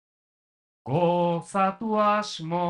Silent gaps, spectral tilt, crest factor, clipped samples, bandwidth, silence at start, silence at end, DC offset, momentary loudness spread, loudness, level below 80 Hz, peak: none; -6 dB/octave; 14 dB; under 0.1%; 11 kHz; 0.85 s; 0 s; under 0.1%; 7 LU; -25 LUFS; -68 dBFS; -12 dBFS